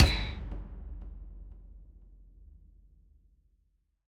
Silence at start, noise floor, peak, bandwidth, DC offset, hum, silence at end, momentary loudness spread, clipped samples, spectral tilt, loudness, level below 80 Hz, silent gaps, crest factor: 0 s; -73 dBFS; -6 dBFS; 15 kHz; under 0.1%; none; 1.55 s; 23 LU; under 0.1%; -5 dB/octave; -36 LUFS; -38 dBFS; none; 28 dB